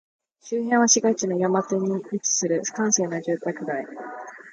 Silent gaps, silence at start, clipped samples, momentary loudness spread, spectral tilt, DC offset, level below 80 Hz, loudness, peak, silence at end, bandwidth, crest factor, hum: none; 0.45 s; under 0.1%; 14 LU; -3.5 dB/octave; under 0.1%; -74 dBFS; -23 LUFS; -6 dBFS; 0 s; 10.5 kHz; 18 dB; none